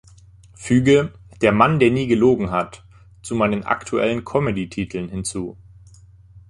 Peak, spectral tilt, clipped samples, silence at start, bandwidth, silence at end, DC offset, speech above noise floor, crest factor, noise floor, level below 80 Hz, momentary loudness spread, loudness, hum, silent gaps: -2 dBFS; -6 dB/octave; under 0.1%; 0.6 s; 11.5 kHz; 0.1 s; under 0.1%; 29 dB; 18 dB; -47 dBFS; -46 dBFS; 15 LU; -19 LUFS; none; none